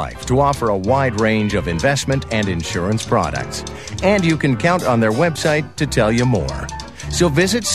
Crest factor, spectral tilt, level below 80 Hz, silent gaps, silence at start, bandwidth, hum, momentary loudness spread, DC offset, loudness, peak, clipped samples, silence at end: 16 dB; -5 dB/octave; -34 dBFS; none; 0 s; 14 kHz; none; 9 LU; 0.6%; -17 LUFS; -2 dBFS; under 0.1%; 0 s